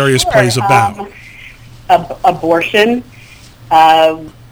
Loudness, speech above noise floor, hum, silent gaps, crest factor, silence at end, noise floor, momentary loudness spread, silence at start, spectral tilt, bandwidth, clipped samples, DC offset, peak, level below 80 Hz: -11 LUFS; 26 dB; none; none; 12 dB; 0.2 s; -37 dBFS; 16 LU; 0 s; -4.5 dB/octave; over 20 kHz; 0.3%; under 0.1%; 0 dBFS; -40 dBFS